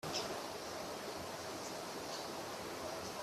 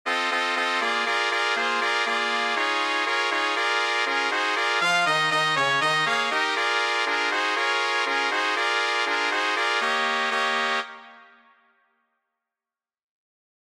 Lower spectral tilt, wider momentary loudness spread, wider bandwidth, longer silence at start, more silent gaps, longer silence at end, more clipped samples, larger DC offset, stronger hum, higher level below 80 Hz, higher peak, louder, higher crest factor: about the same, -2.5 dB/octave vs -1.5 dB/octave; about the same, 3 LU vs 2 LU; about the same, 15.5 kHz vs 15.5 kHz; about the same, 0.05 s vs 0.05 s; neither; second, 0 s vs 2.55 s; neither; neither; neither; first, -72 dBFS vs -78 dBFS; second, -26 dBFS vs -6 dBFS; second, -44 LUFS vs -22 LUFS; about the same, 18 dB vs 18 dB